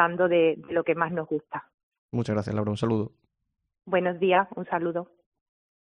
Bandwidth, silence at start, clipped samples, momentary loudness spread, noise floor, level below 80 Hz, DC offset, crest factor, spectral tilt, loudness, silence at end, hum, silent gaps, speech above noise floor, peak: 9 kHz; 0 s; under 0.1%; 13 LU; -81 dBFS; -64 dBFS; under 0.1%; 22 dB; -7.5 dB/octave; -26 LUFS; 0.85 s; none; 1.74-1.92 s, 1.98-2.09 s; 55 dB; -6 dBFS